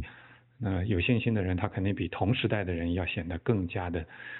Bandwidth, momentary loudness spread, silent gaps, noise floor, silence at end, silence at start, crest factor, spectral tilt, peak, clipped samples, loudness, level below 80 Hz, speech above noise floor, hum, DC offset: 4.2 kHz; 7 LU; none; -55 dBFS; 0 s; 0 s; 18 dB; -6 dB/octave; -12 dBFS; under 0.1%; -30 LUFS; -50 dBFS; 25 dB; none; under 0.1%